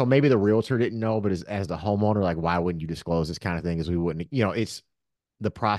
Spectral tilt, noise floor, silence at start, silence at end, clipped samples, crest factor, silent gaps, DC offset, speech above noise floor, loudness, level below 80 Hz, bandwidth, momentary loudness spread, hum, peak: -7.5 dB/octave; -82 dBFS; 0 s; 0 s; under 0.1%; 18 dB; none; under 0.1%; 58 dB; -26 LUFS; -48 dBFS; 12.5 kHz; 10 LU; none; -6 dBFS